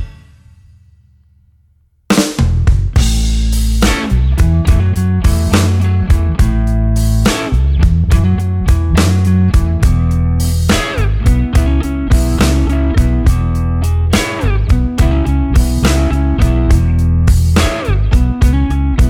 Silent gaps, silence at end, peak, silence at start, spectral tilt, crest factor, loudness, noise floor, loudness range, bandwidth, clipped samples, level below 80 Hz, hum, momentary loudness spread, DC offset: none; 0 s; 0 dBFS; 0 s; -6 dB/octave; 12 dB; -13 LUFS; -53 dBFS; 1 LU; 16.5 kHz; under 0.1%; -14 dBFS; none; 3 LU; under 0.1%